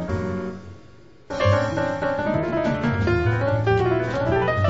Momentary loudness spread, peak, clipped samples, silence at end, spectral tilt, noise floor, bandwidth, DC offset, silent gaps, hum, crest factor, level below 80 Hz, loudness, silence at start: 9 LU; -6 dBFS; under 0.1%; 0 s; -7.5 dB/octave; -49 dBFS; 7.8 kHz; 0.5%; none; none; 16 dB; -40 dBFS; -22 LUFS; 0 s